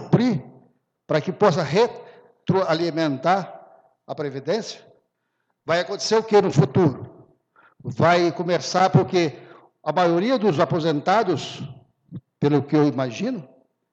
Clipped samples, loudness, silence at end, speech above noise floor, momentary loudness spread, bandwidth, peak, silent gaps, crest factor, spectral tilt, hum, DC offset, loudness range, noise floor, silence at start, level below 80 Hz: under 0.1%; -21 LUFS; 0.45 s; 54 dB; 18 LU; 8.2 kHz; -4 dBFS; none; 18 dB; -6 dB/octave; none; under 0.1%; 5 LU; -74 dBFS; 0 s; -64 dBFS